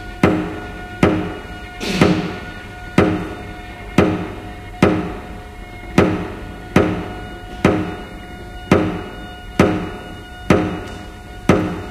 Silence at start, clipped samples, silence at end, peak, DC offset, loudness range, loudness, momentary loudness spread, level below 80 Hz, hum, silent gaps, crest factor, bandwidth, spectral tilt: 0 s; under 0.1%; 0 s; 0 dBFS; under 0.1%; 1 LU; -19 LUFS; 16 LU; -36 dBFS; none; none; 20 dB; 15.5 kHz; -6.5 dB/octave